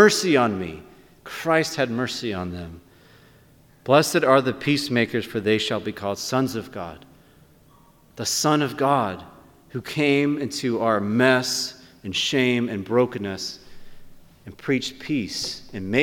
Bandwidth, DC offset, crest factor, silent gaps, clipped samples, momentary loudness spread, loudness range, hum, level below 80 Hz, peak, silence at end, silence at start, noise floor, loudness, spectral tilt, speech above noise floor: 18.5 kHz; under 0.1%; 22 dB; none; under 0.1%; 16 LU; 5 LU; none; -56 dBFS; -2 dBFS; 0 s; 0 s; -54 dBFS; -22 LUFS; -4 dB/octave; 31 dB